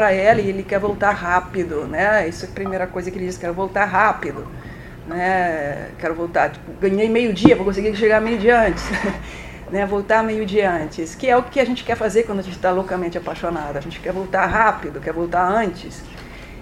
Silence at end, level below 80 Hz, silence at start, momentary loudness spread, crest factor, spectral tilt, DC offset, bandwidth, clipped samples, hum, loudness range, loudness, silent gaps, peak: 0 s; -40 dBFS; 0 s; 12 LU; 20 dB; -6 dB/octave; under 0.1%; 15.5 kHz; under 0.1%; none; 4 LU; -19 LUFS; none; 0 dBFS